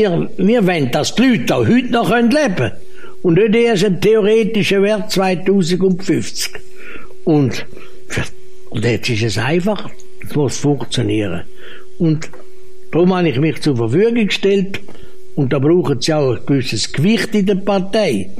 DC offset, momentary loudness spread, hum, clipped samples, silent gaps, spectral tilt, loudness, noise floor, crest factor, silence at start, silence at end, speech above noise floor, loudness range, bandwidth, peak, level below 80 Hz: 7%; 11 LU; none; under 0.1%; none; -6 dB/octave; -15 LUFS; -42 dBFS; 12 dB; 0 s; 0 s; 27 dB; 6 LU; 15 kHz; -4 dBFS; -44 dBFS